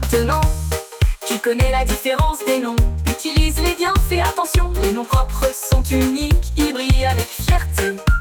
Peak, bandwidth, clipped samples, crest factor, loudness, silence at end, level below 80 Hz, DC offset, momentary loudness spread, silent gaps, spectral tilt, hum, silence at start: -4 dBFS; over 20 kHz; under 0.1%; 12 dB; -19 LUFS; 0 s; -20 dBFS; under 0.1%; 3 LU; none; -5 dB/octave; none; 0 s